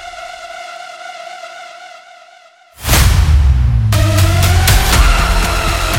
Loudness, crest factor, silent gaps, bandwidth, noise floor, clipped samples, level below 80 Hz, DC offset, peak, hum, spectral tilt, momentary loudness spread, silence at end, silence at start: -12 LUFS; 12 dB; none; 17 kHz; -43 dBFS; under 0.1%; -16 dBFS; under 0.1%; 0 dBFS; none; -4 dB/octave; 19 LU; 0 s; 0 s